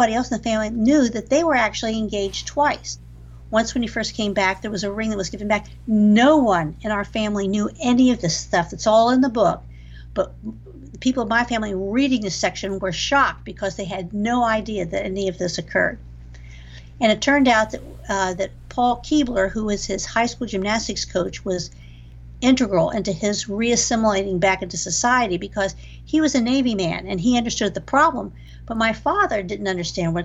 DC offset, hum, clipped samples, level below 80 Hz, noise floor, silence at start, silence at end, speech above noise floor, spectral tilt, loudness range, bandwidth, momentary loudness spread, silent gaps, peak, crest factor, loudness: under 0.1%; none; under 0.1%; -42 dBFS; -40 dBFS; 0 s; 0 s; 20 dB; -4 dB/octave; 4 LU; 8.2 kHz; 10 LU; none; -4 dBFS; 16 dB; -21 LUFS